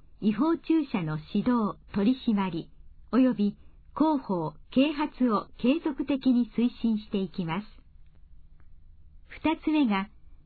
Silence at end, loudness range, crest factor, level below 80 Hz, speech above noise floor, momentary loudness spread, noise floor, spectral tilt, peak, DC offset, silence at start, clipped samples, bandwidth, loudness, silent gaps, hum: 0.1 s; 5 LU; 16 dB; -52 dBFS; 25 dB; 7 LU; -51 dBFS; -10.5 dB/octave; -12 dBFS; under 0.1%; 0.2 s; under 0.1%; 4.7 kHz; -28 LUFS; none; none